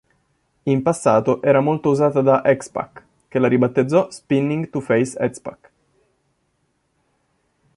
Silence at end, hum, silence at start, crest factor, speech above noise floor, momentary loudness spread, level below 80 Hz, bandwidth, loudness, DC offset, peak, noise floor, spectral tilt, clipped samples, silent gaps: 2.25 s; none; 0.65 s; 18 dB; 50 dB; 13 LU; -60 dBFS; 11.5 kHz; -19 LUFS; under 0.1%; -2 dBFS; -68 dBFS; -7 dB/octave; under 0.1%; none